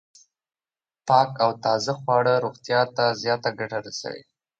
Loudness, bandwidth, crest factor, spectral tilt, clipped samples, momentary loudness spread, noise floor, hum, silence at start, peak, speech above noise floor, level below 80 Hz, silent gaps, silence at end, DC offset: -23 LUFS; 9 kHz; 20 dB; -4.5 dB/octave; under 0.1%; 13 LU; under -90 dBFS; none; 1.05 s; -4 dBFS; over 67 dB; -70 dBFS; none; 0.4 s; under 0.1%